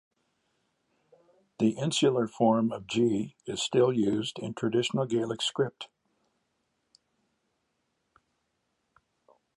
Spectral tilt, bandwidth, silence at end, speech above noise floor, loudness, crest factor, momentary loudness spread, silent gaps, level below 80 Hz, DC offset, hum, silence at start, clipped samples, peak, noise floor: -5 dB/octave; 11.5 kHz; 3.7 s; 51 dB; -28 LUFS; 20 dB; 8 LU; none; -70 dBFS; under 0.1%; none; 1.6 s; under 0.1%; -12 dBFS; -78 dBFS